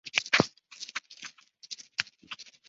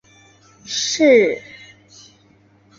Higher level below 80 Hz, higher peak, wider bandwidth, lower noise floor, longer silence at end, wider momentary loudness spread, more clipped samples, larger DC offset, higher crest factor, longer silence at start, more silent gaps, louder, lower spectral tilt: about the same, -68 dBFS vs -64 dBFS; about the same, -4 dBFS vs -2 dBFS; about the same, 8 kHz vs 8 kHz; second, -49 dBFS vs -53 dBFS; second, 0.2 s vs 1.4 s; about the same, 19 LU vs 17 LU; neither; neither; first, 30 dB vs 18 dB; second, 0.05 s vs 0.65 s; neither; second, -30 LUFS vs -16 LUFS; about the same, -1.5 dB/octave vs -2.5 dB/octave